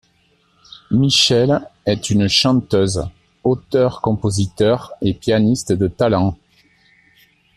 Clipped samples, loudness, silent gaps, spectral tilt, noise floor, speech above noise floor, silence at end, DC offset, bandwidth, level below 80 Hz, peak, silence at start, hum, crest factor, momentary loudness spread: under 0.1%; -17 LUFS; none; -5 dB/octave; -59 dBFS; 43 dB; 1.2 s; under 0.1%; 14 kHz; -44 dBFS; -2 dBFS; 0.9 s; none; 16 dB; 9 LU